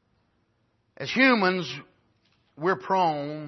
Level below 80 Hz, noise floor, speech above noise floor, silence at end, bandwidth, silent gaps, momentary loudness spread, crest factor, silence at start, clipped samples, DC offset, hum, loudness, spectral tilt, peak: -72 dBFS; -70 dBFS; 46 dB; 0 s; 6.2 kHz; none; 16 LU; 22 dB; 1 s; under 0.1%; under 0.1%; none; -24 LUFS; -5.5 dB/octave; -6 dBFS